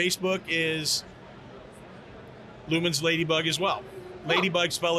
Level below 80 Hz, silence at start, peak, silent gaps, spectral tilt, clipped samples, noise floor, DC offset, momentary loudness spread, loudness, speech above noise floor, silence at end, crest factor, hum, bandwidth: -60 dBFS; 0 s; -12 dBFS; none; -3.5 dB/octave; under 0.1%; -46 dBFS; under 0.1%; 22 LU; -26 LUFS; 20 dB; 0 s; 16 dB; none; 14 kHz